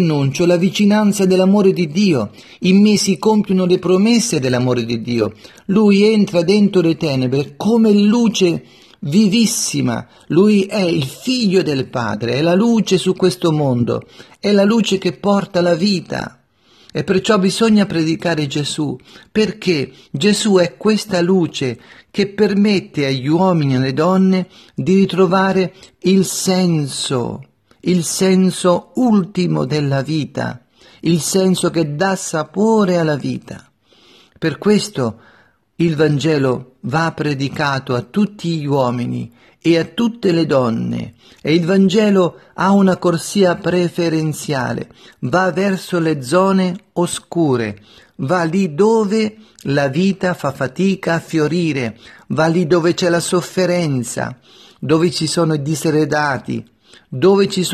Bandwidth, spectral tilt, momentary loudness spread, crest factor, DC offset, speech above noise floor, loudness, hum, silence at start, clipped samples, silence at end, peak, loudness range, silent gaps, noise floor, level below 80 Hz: 13.5 kHz; -5.5 dB/octave; 10 LU; 14 dB; under 0.1%; 36 dB; -16 LUFS; none; 0 s; under 0.1%; 0 s; -2 dBFS; 4 LU; none; -51 dBFS; -54 dBFS